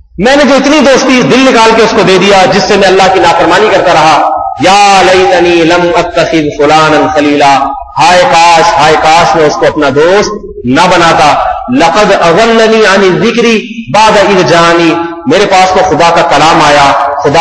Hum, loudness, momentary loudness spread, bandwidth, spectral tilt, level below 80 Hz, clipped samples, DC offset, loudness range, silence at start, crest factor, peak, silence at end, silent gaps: none; -5 LUFS; 5 LU; 11 kHz; -4 dB/octave; -34 dBFS; 7%; under 0.1%; 2 LU; 0.2 s; 4 dB; 0 dBFS; 0 s; none